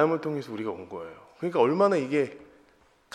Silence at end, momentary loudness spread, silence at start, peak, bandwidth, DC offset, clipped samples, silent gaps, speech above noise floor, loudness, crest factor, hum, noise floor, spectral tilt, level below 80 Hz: 0.7 s; 17 LU; 0 s; -8 dBFS; 11 kHz; under 0.1%; under 0.1%; none; 35 dB; -27 LUFS; 20 dB; none; -62 dBFS; -7 dB/octave; -72 dBFS